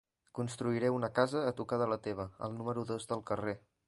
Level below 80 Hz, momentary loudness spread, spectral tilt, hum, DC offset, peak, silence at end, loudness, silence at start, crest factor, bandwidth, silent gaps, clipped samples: -66 dBFS; 9 LU; -6.5 dB/octave; none; under 0.1%; -14 dBFS; 0.3 s; -36 LUFS; 0.35 s; 22 dB; 11.5 kHz; none; under 0.1%